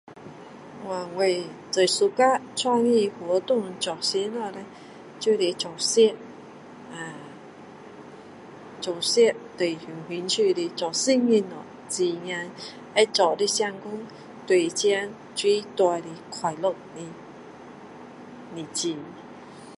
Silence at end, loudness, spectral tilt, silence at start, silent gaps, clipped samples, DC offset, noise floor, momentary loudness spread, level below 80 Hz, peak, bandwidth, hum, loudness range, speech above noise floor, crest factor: 0.05 s; -24 LUFS; -3 dB/octave; 0.1 s; none; under 0.1%; under 0.1%; -44 dBFS; 23 LU; -74 dBFS; -4 dBFS; 11.5 kHz; none; 5 LU; 20 dB; 22 dB